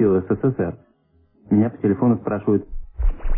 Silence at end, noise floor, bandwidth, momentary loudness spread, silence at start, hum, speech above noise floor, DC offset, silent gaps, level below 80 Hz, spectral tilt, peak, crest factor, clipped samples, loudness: 0 s; -59 dBFS; 3.2 kHz; 10 LU; 0 s; none; 40 dB; under 0.1%; none; -28 dBFS; -14 dB/octave; -6 dBFS; 14 dB; under 0.1%; -21 LUFS